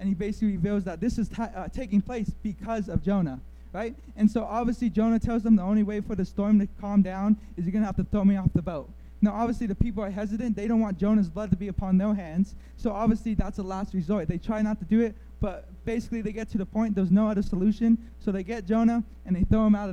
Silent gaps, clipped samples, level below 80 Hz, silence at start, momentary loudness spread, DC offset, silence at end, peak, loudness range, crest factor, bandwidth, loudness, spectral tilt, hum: none; under 0.1%; -40 dBFS; 0 s; 10 LU; under 0.1%; 0 s; -8 dBFS; 4 LU; 18 dB; 8.4 kHz; -27 LUFS; -9 dB/octave; none